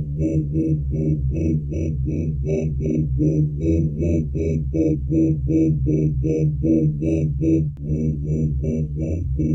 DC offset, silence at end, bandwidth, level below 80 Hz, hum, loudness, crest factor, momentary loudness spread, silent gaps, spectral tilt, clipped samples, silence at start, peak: under 0.1%; 0 s; 6.4 kHz; -30 dBFS; none; -21 LUFS; 14 dB; 5 LU; none; -11 dB/octave; under 0.1%; 0 s; -6 dBFS